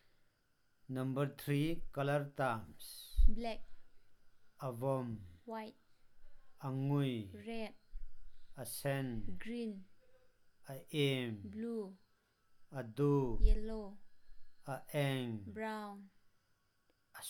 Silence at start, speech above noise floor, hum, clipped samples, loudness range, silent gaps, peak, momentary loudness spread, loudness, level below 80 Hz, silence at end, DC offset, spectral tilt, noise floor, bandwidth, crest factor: 0.9 s; 40 dB; none; under 0.1%; 6 LU; none; -14 dBFS; 15 LU; -40 LUFS; -44 dBFS; 0 s; under 0.1%; -6.5 dB/octave; -77 dBFS; 16.5 kHz; 24 dB